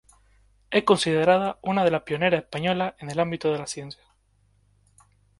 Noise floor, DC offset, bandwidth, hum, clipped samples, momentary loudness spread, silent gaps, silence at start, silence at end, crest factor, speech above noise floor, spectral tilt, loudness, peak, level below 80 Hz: -64 dBFS; under 0.1%; 11.5 kHz; none; under 0.1%; 9 LU; none; 0.7 s; 1.45 s; 22 dB; 41 dB; -5 dB/octave; -24 LUFS; -4 dBFS; -60 dBFS